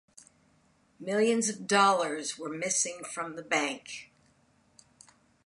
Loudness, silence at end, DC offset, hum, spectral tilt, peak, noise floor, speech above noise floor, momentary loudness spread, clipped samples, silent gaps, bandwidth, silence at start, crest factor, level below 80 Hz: -29 LUFS; 1.4 s; under 0.1%; none; -2.5 dB/octave; -8 dBFS; -67 dBFS; 37 dB; 16 LU; under 0.1%; none; 11.5 kHz; 1 s; 24 dB; -78 dBFS